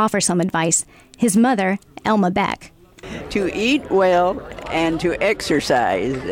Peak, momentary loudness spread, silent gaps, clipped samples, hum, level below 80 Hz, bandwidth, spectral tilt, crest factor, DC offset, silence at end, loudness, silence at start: -6 dBFS; 9 LU; none; under 0.1%; none; -46 dBFS; 17 kHz; -4 dB/octave; 12 dB; under 0.1%; 0 s; -19 LUFS; 0 s